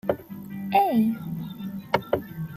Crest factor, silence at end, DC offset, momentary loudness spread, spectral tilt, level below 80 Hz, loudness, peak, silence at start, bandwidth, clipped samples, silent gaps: 22 dB; 0 s; under 0.1%; 14 LU; -7.5 dB/octave; -60 dBFS; -26 LUFS; -6 dBFS; 0.05 s; 15 kHz; under 0.1%; none